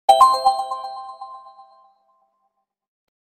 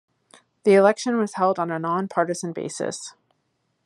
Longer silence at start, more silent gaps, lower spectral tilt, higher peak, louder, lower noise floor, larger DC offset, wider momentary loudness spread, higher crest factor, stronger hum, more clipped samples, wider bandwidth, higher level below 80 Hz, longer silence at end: second, 0.1 s vs 0.65 s; neither; second, -0.5 dB/octave vs -5 dB/octave; about the same, -2 dBFS vs -4 dBFS; first, -17 LUFS vs -22 LUFS; about the same, -73 dBFS vs -72 dBFS; neither; first, 25 LU vs 13 LU; about the same, 20 dB vs 20 dB; neither; neither; first, 16 kHz vs 11.5 kHz; first, -60 dBFS vs -76 dBFS; first, 1.9 s vs 0.75 s